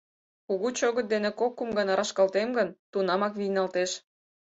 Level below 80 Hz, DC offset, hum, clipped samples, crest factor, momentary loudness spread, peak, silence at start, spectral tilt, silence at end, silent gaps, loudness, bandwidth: -70 dBFS; under 0.1%; none; under 0.1%; 16 dB; 5 LU; -12 dBFS; 0.5 s; -4 dB/octave; 0.6 s; 2.79-2.93 s; -28 LUFS; 8.2 kHz